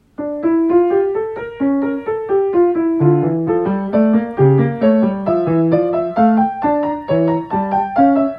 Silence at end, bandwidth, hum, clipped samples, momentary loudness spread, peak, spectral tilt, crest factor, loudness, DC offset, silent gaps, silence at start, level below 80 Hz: 0 s; 5.2 kHz; none; under 0.1%; 5 LU; -2 dBFS; -11.5 dB/octave; 14 dB; -16 LUFS; under 0.1%; none; 0.2 s; -50 dBFS